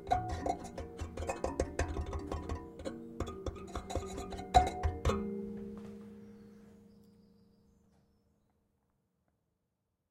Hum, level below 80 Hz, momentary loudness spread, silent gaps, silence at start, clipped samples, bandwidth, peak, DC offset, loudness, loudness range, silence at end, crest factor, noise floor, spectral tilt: none; -46 dBFS; 19 LU; none; 0 s; under 0.1%; 14.5 kHz; -10 dBFS; under 0.1%; -38 LUFS; 15 LU; 3 s; 28 dB; -84 dBFS; -6 dB/octave